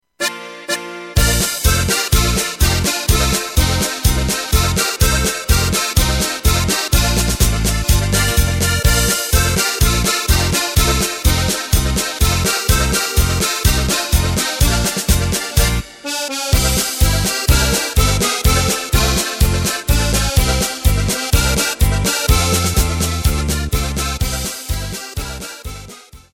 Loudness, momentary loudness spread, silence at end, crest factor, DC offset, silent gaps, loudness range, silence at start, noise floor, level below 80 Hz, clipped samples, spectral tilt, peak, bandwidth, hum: -16 LUFS; 7 LU; 0.15 s; 16 dB; under 0.1%; none; 2 LU; 0.2 s; -38 dBFS; -20 dBFS; under 0.1%; -3.5 dB/octave; 0 dBFS; 17 kHz; none